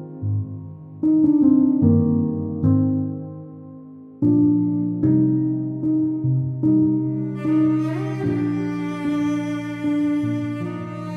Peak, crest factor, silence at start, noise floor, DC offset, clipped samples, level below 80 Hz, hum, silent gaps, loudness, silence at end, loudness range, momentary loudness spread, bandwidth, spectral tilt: -6 dBFS; 14 dB; 0 s; -40 dBFS; under 0.1%; under 0.1%; -54 dBFS; none; none; -21 LUFS; 0 s; 3 LU; 13 LU; 6.2 kHz; -9.5 dB/octave